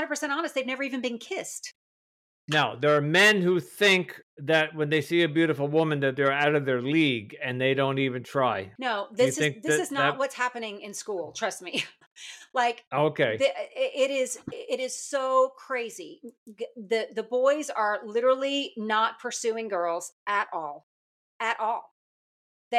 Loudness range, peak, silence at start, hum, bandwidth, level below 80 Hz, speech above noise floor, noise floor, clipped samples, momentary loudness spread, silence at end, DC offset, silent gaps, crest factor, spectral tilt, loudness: 6 LU; -10 dBFS; 0 s; none; 15.5 kHz; -78 dBFS; over 63 dB; under -90 dBFS; under 0.1%; 12 LU; 0 s; under 0.1%; 1.75-2.48 s, 4.23-4.37 s, 12.07-12.16 s, 12.87-12.91 s, 16.38-16.46 s, 20.12-20.26 s, 20.83-21.40 s, 21.91-22.71 s; 16 dB; -4 dB/octave; -26 LUFS